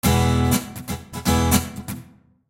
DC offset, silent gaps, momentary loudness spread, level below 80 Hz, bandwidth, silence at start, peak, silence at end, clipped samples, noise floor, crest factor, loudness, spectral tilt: under 0.1%; none; 15 LU; -32 dBFS; 17 kHz; 0.05 s; -4 dBFS; 0.45 s; under 0.1%; -48 dBFS; 18 dB; -21 LUFS; -5 dB/octave